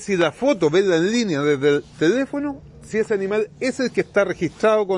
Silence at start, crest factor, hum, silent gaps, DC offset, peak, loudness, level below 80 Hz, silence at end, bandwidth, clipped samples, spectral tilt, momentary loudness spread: 0 s; 14 dB; none; none; under 0.1%; -6 dBFS; -20 LUFS; -54 dBFS; 0 s; 11 kHz; under 0.1%; -5.5 dB/octave; 7 LU